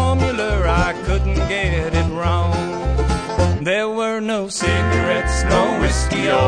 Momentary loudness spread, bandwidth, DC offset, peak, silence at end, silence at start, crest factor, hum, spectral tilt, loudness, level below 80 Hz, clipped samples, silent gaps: 4 LU; 10 kHz; 0.2%; -2 dBFS; 0 s; 0 s; 14 dB; none; -5.5 dB/octave; -19 LUFS; -24 dBFS; under 0.1%; none